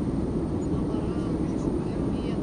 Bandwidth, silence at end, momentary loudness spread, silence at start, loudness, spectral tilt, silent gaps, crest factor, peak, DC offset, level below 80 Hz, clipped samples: 10.5 kHz; 0 s; 1 LU; 0 s; -28 LUFS; -8.5 dB/octave; none; 14 dB; -14 dBFS; under 0.1%; -38 dBFS; under 0.1%